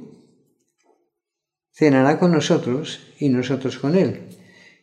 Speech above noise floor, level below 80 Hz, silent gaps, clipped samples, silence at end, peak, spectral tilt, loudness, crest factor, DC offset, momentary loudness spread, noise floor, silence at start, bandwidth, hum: 66 dB; -68 dBFS; none; under 0.1%; 0.5 s; -4 dBFS; -6.5 dB/octave; -19 LUFS; 18 dB; under 0.1%; 10 LU; -85 dBFS; 0 s; 10 kHz; none